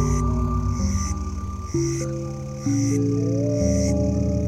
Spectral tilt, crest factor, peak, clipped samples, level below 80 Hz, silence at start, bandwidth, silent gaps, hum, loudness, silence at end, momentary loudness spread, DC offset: -7 dB/octave; 14 dB; -8 dBFS; under 0.1%; -30 dBFS; 0 s; 14.5 kHz; none; none; -24 LUFS; 0 s; 8 LU; under 0.1%